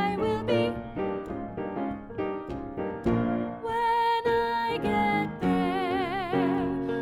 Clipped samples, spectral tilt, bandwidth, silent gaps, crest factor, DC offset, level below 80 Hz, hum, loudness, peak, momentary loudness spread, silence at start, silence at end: under 0.1%; -7 dB/octave; 16 kHz; none; 14 dB; under 0.1%; -50 dBFS; none; -28 LUFS; -14 dBFS; 9 LU; 0 s; 0 s